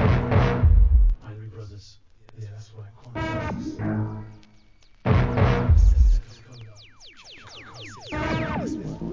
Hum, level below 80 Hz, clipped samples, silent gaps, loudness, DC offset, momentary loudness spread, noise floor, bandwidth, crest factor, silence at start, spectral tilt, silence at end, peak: none; -24 dBFS; under 0.1%; none; -23 LUFS; 0.2%; 24 LU; -55 dBFS; 7.2 kHz; 16 dB; 0 s; -8 dB/octave; 0 s; -6 dBFS